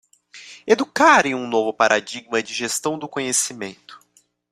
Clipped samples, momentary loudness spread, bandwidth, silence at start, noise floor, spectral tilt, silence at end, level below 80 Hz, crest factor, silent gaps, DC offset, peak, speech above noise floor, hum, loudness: under 0.1%; 16 LU; 15.5 kHz; 0.35 s; -60 dBFS; -2 dB/octave; 0.55 s; -66 dBFS; 20 dB; none; under 0.1%; 0 dBFS; 40 dB; none; -19 LUFS